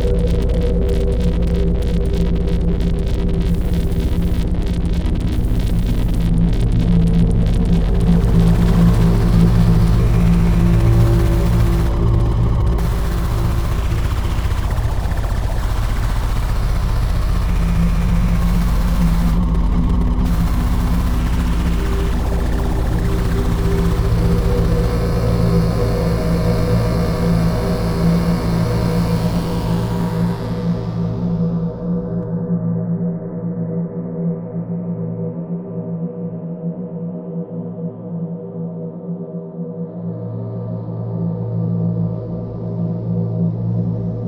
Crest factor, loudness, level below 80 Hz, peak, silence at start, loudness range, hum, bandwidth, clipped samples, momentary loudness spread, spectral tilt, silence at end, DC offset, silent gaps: 14 dB; -19 LUFS; -20 dBFS; -2 dBFS; 0 s; 10 LU; none; over 20 kHz; under 0.1%; 11 LU; -8 dB/octave; 0 s; under 0.1%; none